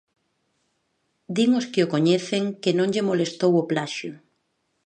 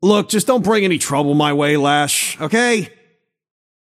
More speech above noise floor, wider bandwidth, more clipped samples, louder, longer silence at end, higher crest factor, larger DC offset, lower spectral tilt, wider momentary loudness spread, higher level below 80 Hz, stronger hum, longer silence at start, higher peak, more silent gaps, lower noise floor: first, 51 dB vs 45 dB; second, 9.6 kHz vs 15.5 kHz; neither; second, -23 LUFS vs -16 LUFS; second, 0.7 s vs 1.05 s; about the same, 18 dB vs 16 dB; neither; first, -5.5 dB/octave vs -4 dB/octave; first, 9 LU vs 3 LU; second, -72 dBFS vs -58 dBFS; neither; first, 1.3 s vs 0 s; second, -6 dBFS vs -2 dBFS; neither; first, -73 dBFS vs -61 dBFS